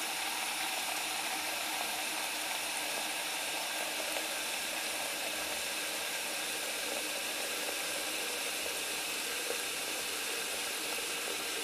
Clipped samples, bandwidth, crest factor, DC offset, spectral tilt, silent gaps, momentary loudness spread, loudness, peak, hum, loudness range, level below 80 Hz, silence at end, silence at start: under 0.1%; 15.5 kHz; 18 dB; under 0.1%; 1 dB/octave; none; 1 LU; -34 LUFS; -20 dBFS; none; 0 LU; -72 dBFS; 0 s; 0 s